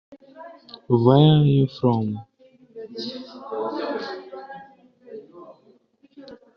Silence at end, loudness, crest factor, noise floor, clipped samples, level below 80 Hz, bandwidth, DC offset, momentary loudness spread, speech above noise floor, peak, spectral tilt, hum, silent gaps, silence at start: 0.2 s; -21 LUFS; 20 dB; -58 dBFS; under 0.1%; -60 dBFS; 6 kHz; under 0.1%; 27 LU; 40 dB; -4 dBFS; -7.5 dB/octave; none; none; 0.1 s